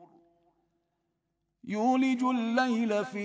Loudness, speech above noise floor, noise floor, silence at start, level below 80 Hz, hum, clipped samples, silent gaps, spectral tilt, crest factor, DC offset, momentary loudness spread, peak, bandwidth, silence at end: -28 LUFS; 53 dB; -81 dBFS; 0 s; -82 dBFS; none; under 0.1%; none; -5.5 dB/octave; 18 dB; under 0.1%; 4 LU; -14 dBFS; 8 kHz; 0 s